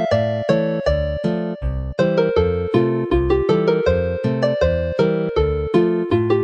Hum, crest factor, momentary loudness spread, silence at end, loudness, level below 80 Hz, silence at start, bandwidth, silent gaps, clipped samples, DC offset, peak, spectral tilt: none; 16 dB; 4 LU; 0 s; -19 LUFS; -30 dBFS; 0 s; 8.2 kHz; none; under 0.1%; under 0.1%; -2 dBFS; -8 dB/octave